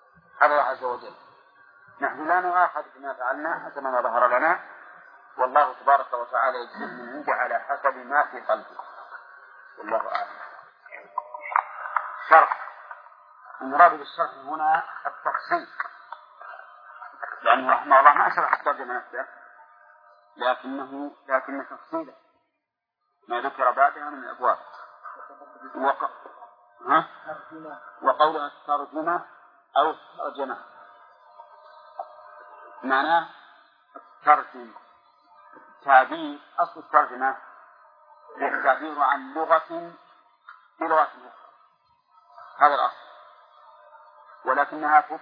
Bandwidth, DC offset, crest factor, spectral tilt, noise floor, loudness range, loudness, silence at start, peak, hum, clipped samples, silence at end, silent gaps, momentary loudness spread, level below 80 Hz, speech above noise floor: 5.2 kHz; under 0.1%; 26 dB; -6 dB/octave; -81 dBFS; 9 LU; -24 LUFS; 0.35 s; 0 dBFS; none; under 0.1%; 0.05 s; none; 22 LU; under -90 dBFS; 58 dB